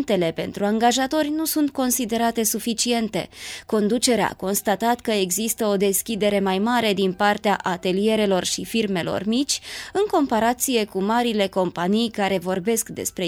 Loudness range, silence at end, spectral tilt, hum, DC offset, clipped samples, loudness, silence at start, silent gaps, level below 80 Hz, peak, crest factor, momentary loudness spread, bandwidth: 1 LU; 0 s; -3.5 dB/octave; none; under 0.1%; under 0.1%; -22 LUFS; 0 s; none; -54 dBFS; -6 dBFS; 16 dB; 4 LU; 18.5 kHz